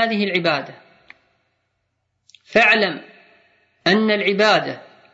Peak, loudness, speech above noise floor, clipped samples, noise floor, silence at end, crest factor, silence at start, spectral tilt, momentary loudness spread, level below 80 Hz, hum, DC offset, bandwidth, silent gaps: -2 dBFS; -17 LUFS; 55 dB; under 0.1%; -72 dBFS; 0.35 s; 18 dB; 0 s; -5 dB/octave; 18 LU; -66 dBFS; none; under 0.1%; 8 kHz; none